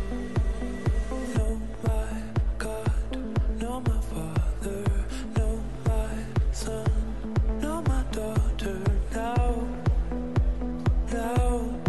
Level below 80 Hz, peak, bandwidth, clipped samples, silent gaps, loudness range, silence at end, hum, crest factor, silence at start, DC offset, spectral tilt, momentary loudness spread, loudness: -28 dBFS; -12 dBFS; 12.5 kHz; under 0.1%; none; 2 LU; 0 s; none; 14 dB; 0 s; 1%; -7 dB/octave; 4 LU; -29 LUFS